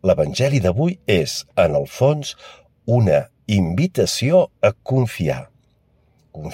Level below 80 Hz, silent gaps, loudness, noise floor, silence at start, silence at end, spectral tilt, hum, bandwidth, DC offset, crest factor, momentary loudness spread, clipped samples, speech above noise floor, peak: -48 dBFS; none; -19 LUFS; -59 dBFS; 0.05 s; 0 s; -6 dB/octave; none; 16.5 kHz; under 0.1%; 16 dB; 8 LU; under 0.1%; 41 dB; -2 dBFS